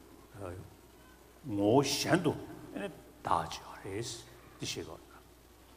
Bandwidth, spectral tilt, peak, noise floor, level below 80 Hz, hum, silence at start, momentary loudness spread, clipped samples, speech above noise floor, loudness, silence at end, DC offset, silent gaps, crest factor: 15.5 kHz; -4.5 dB/octave; -12 dBFS; -58 dBFS; -62 dBFS; none; 0 s; 21 LU; under 0.1%; 25 dB; -34 LUFS; 0 s; under 0.1%; none; 24 dB